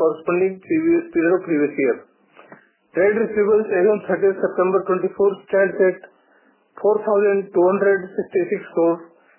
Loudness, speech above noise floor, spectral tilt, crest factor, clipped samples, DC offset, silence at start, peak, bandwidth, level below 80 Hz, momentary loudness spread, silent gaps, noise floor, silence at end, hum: -19 LUFS; 39 dB; -11.5 dB/octave; 14 dB; under 0.1%; under 0.1%; 0 s; -6 dBFS; 3.1 kHz; -64 dBFS; 5 LU; none; -57 dBFS; 0.35 s; none